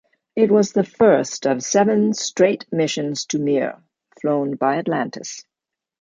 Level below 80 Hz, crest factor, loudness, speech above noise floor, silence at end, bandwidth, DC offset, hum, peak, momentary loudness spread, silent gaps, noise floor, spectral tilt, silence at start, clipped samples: -64 dBFS; 16 dB; -19 LUFS; 67 dB; 0.6 s; 9.4 kHz; under 0.1%; none; -2 dBFS; 12 LU; none; -86 dBFS; -4.5 dB/octave; 0.35 s; under 0.1%